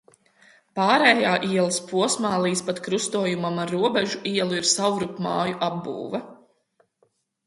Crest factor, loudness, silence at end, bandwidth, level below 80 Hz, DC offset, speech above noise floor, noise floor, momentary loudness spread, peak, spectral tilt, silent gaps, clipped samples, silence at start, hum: 22 dB; -23 LUFS; 1.15 s; 11.5 kHz; -68 dBFS; under 0.1%; 45 dB; -68 dBFS; 11 LU; -2 dBFS; -3.5 dB/octave; none; under 0.1%; 0.75 s; none